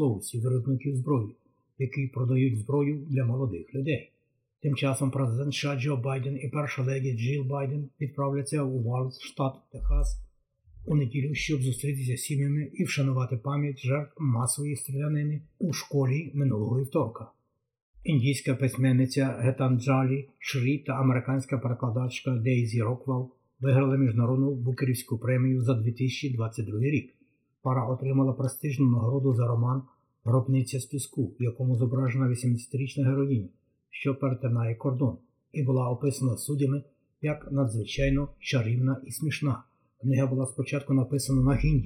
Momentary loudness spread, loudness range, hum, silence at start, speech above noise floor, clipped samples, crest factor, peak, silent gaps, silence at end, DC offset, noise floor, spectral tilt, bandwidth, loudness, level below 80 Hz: 7 LU; 3 LU; none; 0 s; 33 dB; under 0.1%; 14 dB; -14 dBFS; 17.82-17.94 s; 0 s; under 0.1%; -60 dBFS; -6.5 dB/octave; 13 kHz; -28 LUFS; -44 dBFS